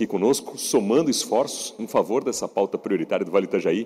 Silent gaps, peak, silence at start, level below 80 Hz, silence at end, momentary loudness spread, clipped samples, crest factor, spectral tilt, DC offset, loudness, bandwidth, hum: none; -8 dBFS; 0 s; -68 dBFS; 0 s; 5 LU; under 0.1%; 14 dB; -4 dB/octave; under 0.1%; -23 LUFS; 16 kHz; none